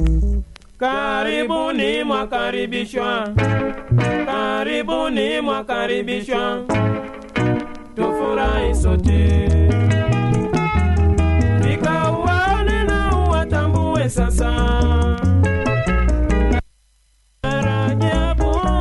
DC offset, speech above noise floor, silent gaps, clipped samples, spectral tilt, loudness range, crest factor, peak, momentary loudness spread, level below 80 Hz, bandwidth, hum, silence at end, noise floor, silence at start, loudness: under 0.1%; 40 dB; none; under 0.1%; -6.5 dB/octave; 4 LU; 12 dB; -4 dBFS; 6 LU; -22 dBFS; 11.5 kHz; none; 0 s; -57 dBFS; 0 s; -19 LUFS